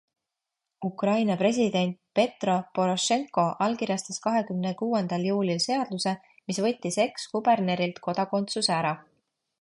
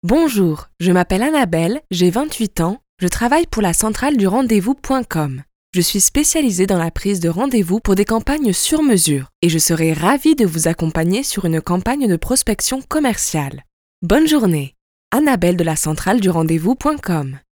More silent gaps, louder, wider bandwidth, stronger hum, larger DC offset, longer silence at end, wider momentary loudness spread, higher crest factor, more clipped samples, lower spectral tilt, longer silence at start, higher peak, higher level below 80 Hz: second, none vs 2.89-2.97 s, 5.55-5.73 s, 9.35-9.42 s, 13.73-14.02 s, 14.81-15.11 s; second, -27 LUFS vs -16 LUFS; second, 11.5 kHz vs over 20 kHz; neither; neither; first, 0.6 s vs 0.2 s; about the same, 6 LU vs 7 LU; about the same, 18 dB vs 16 dB; neither; about the same, -4.5 dB/octave vs -4.5 dB/octave; first, 0.8 s vs 0.05 s; second, -8 dBFS vs 0 dBFS; second, -72 dBFS vs -34 dBFS